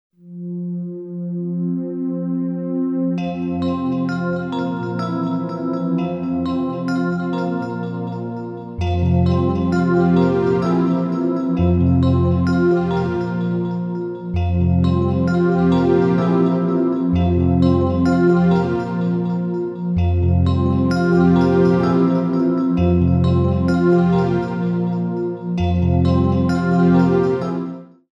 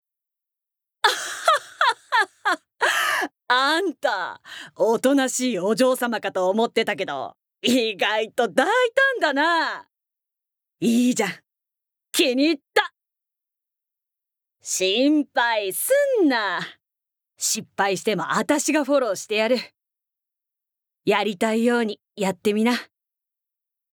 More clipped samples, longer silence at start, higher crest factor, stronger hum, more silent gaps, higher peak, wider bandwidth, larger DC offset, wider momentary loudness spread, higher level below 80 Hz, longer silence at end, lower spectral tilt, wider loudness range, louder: neither; second, 0.25 s vs 1.05 s; second, 14 dB vs 20 dB; neither; neither; about the same, -4 dBFS vs -4 dBFS; second, 7.4 kHz vs over 20 kHz; neither; about the same, 9 LU vs 8 LU; first, -36 dBFS vs -80 dBFS; second, 0.3 s vs 1.1 s; first, -9.5 dB/octave vs -2.5 dB/octave; first, 6 LU vs 3 LU; first, -18 LUFS vs -22 LUFS